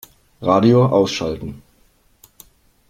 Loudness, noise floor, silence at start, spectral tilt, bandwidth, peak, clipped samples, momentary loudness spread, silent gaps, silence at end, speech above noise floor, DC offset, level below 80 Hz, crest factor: -16 LUFS; -57 dBFS; 0.4 s; -7 dB/octave; 16 kHz; 0 dBFS; under 0.1%; 16 LU; none; 1.3 s; 41 dB; under 0.1%; -48 dBFS; 20 dB